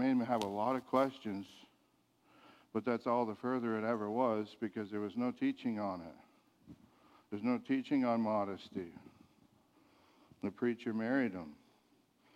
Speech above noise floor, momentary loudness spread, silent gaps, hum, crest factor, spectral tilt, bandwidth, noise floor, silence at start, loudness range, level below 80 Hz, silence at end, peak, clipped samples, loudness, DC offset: 37 dB; 13 LU; none; none; 20 dB; -7 dB/octave; 11.5 kHz; -74 dBFS; 0 s; 4 LU; -80 dBFS; 0.8 s; -18 dBFS; under 0.1%; -37 LUFS; under 0.1%